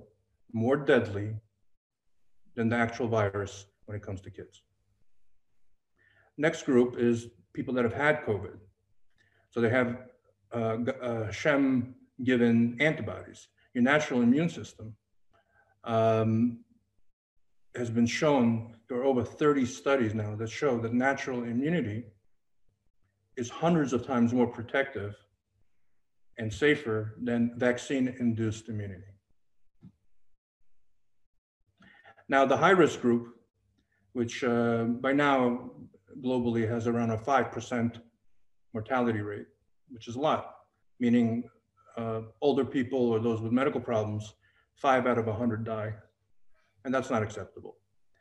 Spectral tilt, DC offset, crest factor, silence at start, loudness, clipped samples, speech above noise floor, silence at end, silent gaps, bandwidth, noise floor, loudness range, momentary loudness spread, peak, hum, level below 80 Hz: -6.5 dB/octave; under 0.1%; 22 dB; 0.55 s; -29 LUFS; under 0.1%; 45 dB; 0.5 s; 1.77-1.90 s, 17.13-17.36 s, 22.90-22.94 s, 30.38-30.60 s, 31.26-31.60 s; 9.2 kHz; -73 dBFS; 6 LU; 17 LU; -8 dBFS; none; -66 dBFS